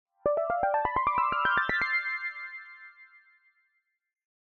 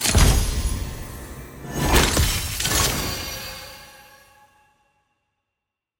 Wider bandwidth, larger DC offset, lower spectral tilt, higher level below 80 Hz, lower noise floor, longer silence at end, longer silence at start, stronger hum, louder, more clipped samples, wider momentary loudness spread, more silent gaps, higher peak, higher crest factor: second, 6.6 kHz vs 17 kHz; neither; first, -5.5 dB/octave vs -3 dB/octave; second, -58 dBFS vs -28 dBFS; second, -77 dBFS vs -84 dBFS; second, 1.35 s vs 2.05 s; first, 0.25 s vs 0 s; neither; second, -28 LUFS vs -21 LUFS; neither; second, 16 LU vs 20 LU; neither; second, -12 dBFS vs -2 dBFS; about the same, 18 dB vs 22 dB